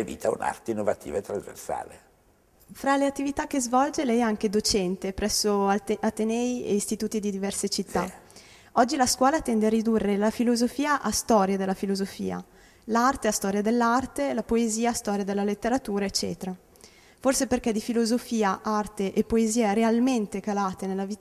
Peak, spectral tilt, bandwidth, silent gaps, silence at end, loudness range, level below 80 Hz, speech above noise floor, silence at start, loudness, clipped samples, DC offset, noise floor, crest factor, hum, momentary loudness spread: -8 dBFS; -4 dB/octave; 15 kHz; none; 0.05 s; 3 LU; -52 dBFS; 36 dB; 0 s; -26 LUFS; under 0.1%; under 0.1%; -61 dBFS; 18 dB; none; 9 LU